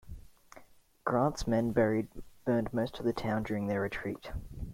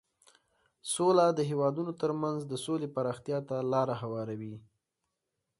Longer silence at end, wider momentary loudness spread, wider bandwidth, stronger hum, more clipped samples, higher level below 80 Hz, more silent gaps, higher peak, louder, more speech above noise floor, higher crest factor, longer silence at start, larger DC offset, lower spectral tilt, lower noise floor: second, 0 s vs 1 s; about the same, 14 LU vs 13 LU; first, 16.5 kHz vs 11.5 kHz; neither; neither; first, -50 dBFS vs -74 dBFS; neither; about the same, -14 dBFS vs -12 dBFS; about the same, -33 LUFS vs -31 LUFS; second, 26 dB vs 54 dB; about the same, 20 dB vs 20 dB; second, 0.05 s vs 0.85 s; neither; about the same, -7 dB/octave vs -6 dB/octave; second, -57 dBFS vs -85 dBFS